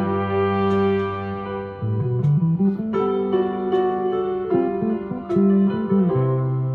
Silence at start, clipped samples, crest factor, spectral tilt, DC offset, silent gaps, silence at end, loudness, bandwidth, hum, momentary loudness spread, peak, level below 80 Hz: 0 s; under 0.1%; 14 dB; -10.5 dB/octave; under 0.1%; none; 0 s; -21 LUFS; 4.6 kHz; none; 7 LU; -8 dBFS; -54 dBFS